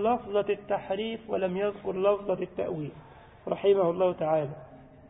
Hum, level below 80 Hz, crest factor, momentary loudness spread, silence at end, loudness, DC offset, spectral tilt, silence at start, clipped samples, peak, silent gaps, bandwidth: none; -60 dBFS; 18 dB; 12 LU; 0.05 s; -29 LUFS; under 0.1%; -10.5 dB/octave; 0 s; under 0.1%; -12 dBFS; none; 3.9 kHz